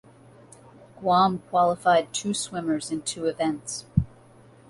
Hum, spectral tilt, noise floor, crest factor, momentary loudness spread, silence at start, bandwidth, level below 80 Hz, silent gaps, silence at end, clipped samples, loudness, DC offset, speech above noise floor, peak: none; -4.5 dB/octave; -52 dBFS; 20 dB; 9 LU; 0.95 s; 11.5 kHz; -48 dBFS; none; 0.6 s; under 0.1%; -25 LUFS; under 0.1%; 28 dB; -6 dBFS